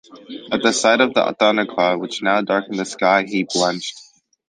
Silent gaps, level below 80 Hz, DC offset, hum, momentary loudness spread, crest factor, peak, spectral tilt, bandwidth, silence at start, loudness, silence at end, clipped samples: none; -66 dBFS; under 0.1%; none; 11 LU; 18 dB; -2 dBFS; -3 dB/octave; 10 kHz; 0.1 s; -18 LUFS; 0.45 s; under 0.1%